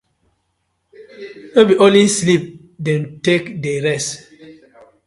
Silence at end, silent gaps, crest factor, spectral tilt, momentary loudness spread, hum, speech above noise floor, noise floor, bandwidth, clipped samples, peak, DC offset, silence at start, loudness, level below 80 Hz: 0.55 s; none; 18 dB; -4.5 dB/octave; 24 LU; none; 54 dB; -69 dBFS; 11.5 kHz; under 0.1%; 0 dBFS; under 0.1%; 1 s; -15 LUFS; -58 dBFS